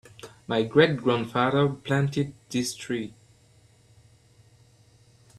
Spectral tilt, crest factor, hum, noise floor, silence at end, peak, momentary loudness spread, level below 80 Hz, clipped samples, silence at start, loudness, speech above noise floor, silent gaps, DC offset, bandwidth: -5.5 dB/octave; 22 dB; none; -58 dBFS; 2.3 s; -4 dBFS; 12 LU; -62 dBFS; under 0.1%; 0.25 s; -25 LUFS; 34 dB; none; under 0.1%; 13 kHz